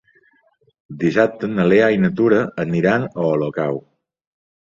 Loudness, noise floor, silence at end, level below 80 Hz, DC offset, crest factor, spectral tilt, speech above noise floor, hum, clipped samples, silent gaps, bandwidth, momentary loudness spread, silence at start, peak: -18 LUFS; -60 dBFS; 0.9 s; -54 dBFS; under 0.1%; 16 dB; -8 dB/octave; 43 dB; none; under 0.1%; none; 7.4 kHz; 9 LU; 0.9 s; -2 dBFS